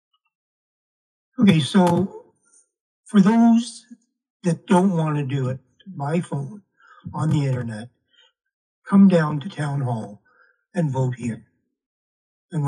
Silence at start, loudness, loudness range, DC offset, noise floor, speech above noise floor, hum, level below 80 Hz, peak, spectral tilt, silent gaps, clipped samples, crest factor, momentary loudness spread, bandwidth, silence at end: 1.4 s; -21 LUFS; 8 LU; under 0.1%; -60 dBFS; 41 dB; none; -66 dBFS; -2 dBFS; -7.5 dB/octave; 2.81-3.03 s, 4.30-4.40 s, 8.53-8.82 s, 11.86-12.49 s; under 0.1%; 20 dB; 19 LU; 11 kHz; 0 s